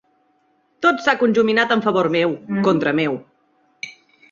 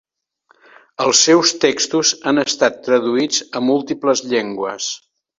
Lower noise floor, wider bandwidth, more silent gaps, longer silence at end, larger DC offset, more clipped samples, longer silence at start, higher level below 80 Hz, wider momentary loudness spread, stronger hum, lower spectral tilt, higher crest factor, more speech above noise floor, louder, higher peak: about the same, -62 dBFS vs -59 dBFS; about the same, 7.6 kHz vs 8 kHz; neither; about the same, 0.4 s vs 0.45 s; neither; neither; second, 0.8 s vs 1 s; about the same, -62 dBFS vs -62 dBFS; first, 18 LU vs 11 LU; neither; first, -6 dB/octave vs -2 dB/octave; about the same, 18 dB vs 18 dB; about the same, 45 dB vs 43 dB; about the same, -18 LUFS vs -16 LUFS; about the same, -2 dBFS vs 0 dBFS